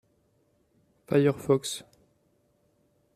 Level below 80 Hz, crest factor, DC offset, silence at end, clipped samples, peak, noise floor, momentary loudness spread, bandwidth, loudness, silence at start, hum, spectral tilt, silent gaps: -68 dBFS; 20 dB; under 0.1%; 1.35 s; under 0.1%; -10 dBFS; -69 dBFS; 12 LU; 14.5 kHz; -27 LUFS; 1.1 s; none; -6 dB/octave; none